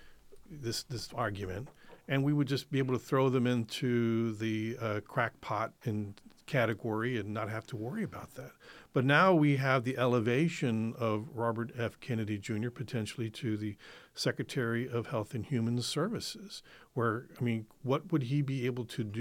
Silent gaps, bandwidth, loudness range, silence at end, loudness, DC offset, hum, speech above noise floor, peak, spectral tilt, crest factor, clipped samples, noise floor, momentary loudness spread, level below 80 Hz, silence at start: none; 16.5 kHz; 6 LU; 0 s; -33 LUFS; under 0.1%; none; 21 dB; -12 dBFS; -6 dB/octave; 22 dB; under 0.1%; -54 dBFS; 12 LU; -66 dBFS; 0 s